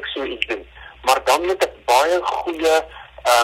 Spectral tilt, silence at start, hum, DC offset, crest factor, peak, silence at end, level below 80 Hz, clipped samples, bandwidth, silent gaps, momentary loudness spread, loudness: -1.5 dB/octave; 0 s; none; under 0.1%; 18 dB; 0 dBFS; 0 s; -48 dBFS; under 0.1%; 16.5 kHz; none; 9 LU; -19 LUFS